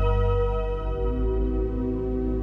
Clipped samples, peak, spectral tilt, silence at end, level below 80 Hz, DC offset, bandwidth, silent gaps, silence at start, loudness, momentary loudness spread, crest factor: under 0.1%; -12 dBFS; -10 dB/octave; 0 s; -26 dBFS; under 0.1%; 4 kHz; none; 0 s; -27 LUFS; 5 LU; 12 dB